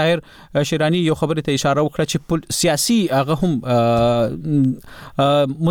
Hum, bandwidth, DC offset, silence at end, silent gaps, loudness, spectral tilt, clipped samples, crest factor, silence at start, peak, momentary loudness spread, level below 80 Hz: none; 19 kHz; 0.1%; 0 s; none; -18 LUFS; -5 dB/octave; under 0.1%; 12 dB; 0 s; -6 dBFS; 6 LU; -44 dBFS